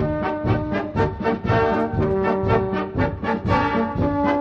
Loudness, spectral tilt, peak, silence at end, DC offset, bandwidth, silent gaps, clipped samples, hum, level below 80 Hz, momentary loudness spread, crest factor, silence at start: -22 LUFS; -8.5 dB/octave; -6 dBFS; 0 s; under 0.1%; 7 kHz; none; under 0.1%; none; -36 dBFS; 4 LU; 16 dB; 0 s